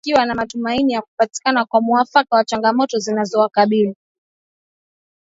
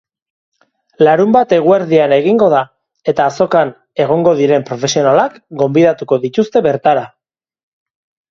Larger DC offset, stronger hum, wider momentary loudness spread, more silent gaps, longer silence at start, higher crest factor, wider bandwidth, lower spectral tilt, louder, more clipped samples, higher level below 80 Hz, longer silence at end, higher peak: neither; neither; about the same, 6 LU vs 8 LU; first, 1.08-1.18 s vs none; second, 0.05 s vs 1 s; about the same, 18 dB vs 14 dB; about the same, 8 kHz vs 7.4 kHz; second, -4.5 dB/octave vs -6 dB/octave; second, -17 LUFS vs -12 LUFS; neither; about the same, -56 dBFS vs -56 dBFS; first, 1.4 s vs 1.25 s; about the same, 0 dBFS vs 0 dBFS